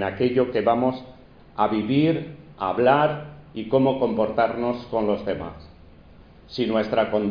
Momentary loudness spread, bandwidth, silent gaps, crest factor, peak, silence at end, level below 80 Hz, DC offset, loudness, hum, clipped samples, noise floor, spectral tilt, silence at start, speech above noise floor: 15 LU; 5.2 kHz; none; 20 dB; -4 dBFS; 0 s; -52 dBFS; under 0.1%; -23 LUFS; none; under 0.1%; -48 dBFS; -8.5 dB/octave; 0 s; 26 dB